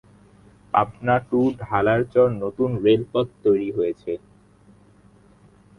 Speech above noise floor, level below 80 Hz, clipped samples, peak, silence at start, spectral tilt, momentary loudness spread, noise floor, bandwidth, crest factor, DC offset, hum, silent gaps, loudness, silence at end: 32 dB; -54 dBFS; under 0.1%; -4 dBFS; 0.75 s; -8.5 dB/octave; 7 LU; -53 dBFS; 10.5 kHz; 20 dB; under 0.1%; 50 Hz at -50 dBFS; none; -22 LUFS; 1.6 s